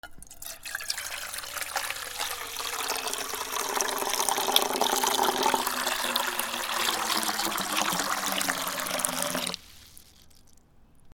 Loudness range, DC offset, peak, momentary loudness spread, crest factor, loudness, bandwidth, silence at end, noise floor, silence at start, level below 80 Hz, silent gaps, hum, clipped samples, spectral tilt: 5 LU; under 0.1%; 0 dBFS; 9 LU; 30 dB; -28 LUFS; over 20 kHz; 0.05 s; -55 dBFS; 0.05 s; -60 dBFS; none; none; under 0.1%; -0.5 dB/octave